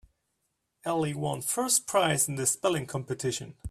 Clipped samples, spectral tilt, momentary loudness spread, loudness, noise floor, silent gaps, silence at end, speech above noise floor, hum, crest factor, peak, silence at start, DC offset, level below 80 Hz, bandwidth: under 0.1%; -3.5 dB/octave; 9 LU; -28 LUFS; -79 dBFS; none; 0 s; 50 dB; none; 20 dB; -10 dBFS; 0.85 s; under 0.1%; -64 dBFS; 15.5 kHz